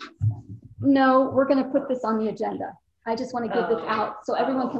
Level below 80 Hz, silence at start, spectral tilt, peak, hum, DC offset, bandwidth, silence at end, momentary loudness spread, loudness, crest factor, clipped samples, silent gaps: -54 dBFS; 0 s; -7.5 dB/octave; -8 dBFS; none; under 0.1%; 8 kHz; 0 s; 14 LU; -24 LUFS; 16 dB; under 0.1%; none